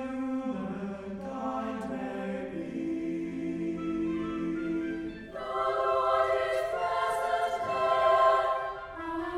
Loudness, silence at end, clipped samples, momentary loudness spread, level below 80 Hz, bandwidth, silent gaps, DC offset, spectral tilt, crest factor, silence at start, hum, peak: -30 LUFS; 0 s; under 0.1%; 12 LU; -58 dBFS; 14 kHz; none; under 0.1%; -6 dB/octave; 18 dB; 0 s; none; -12 dBFS